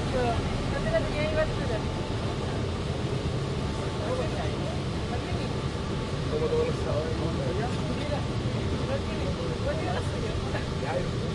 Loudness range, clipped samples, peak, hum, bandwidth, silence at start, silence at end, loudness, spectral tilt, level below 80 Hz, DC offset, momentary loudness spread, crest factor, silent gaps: 1 LU; under 0.1%; -14 dBFS; none; 11.5 kHz; 0 s; 0 s; -30 LUFS; -6.5 dB/octave; -38 dBFS; under 0.1%; 4 LU; 14 dB; none